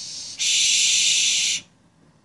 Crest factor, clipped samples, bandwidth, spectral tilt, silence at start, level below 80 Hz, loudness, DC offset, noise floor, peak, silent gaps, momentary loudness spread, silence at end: 16 dB; under 0.1%; 11.5 kHz; 3.5 dB/octave; 0 s; -68 dBFS; -17 LUFS; under 0.1%; -57 dBFS; -6 dBFS; none; 10 LU; 0.65 s